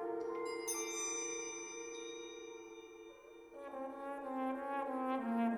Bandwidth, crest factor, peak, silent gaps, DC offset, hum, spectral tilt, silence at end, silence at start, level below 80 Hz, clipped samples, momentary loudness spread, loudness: over 20 kHz; 16 dB; -26 dBFS; none; under 0.1%; none; -2.5 dB/octave; 0 s; 0 s; -78 dBFS; under 0.1%; 15 LU; -42 LUFS